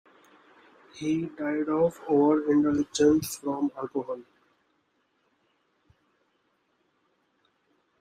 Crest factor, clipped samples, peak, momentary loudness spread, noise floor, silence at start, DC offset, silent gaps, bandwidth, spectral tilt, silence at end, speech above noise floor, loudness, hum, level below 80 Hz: 18 dB; under 0.1%; -10 dBFS; 11 LU; -72 dBFS; 0.95 s; under 0.1%; none; 15 kHz; -5.5 dB/octave; 3.8 s; 47 dB; -26 LUFS; none; -66 dBFS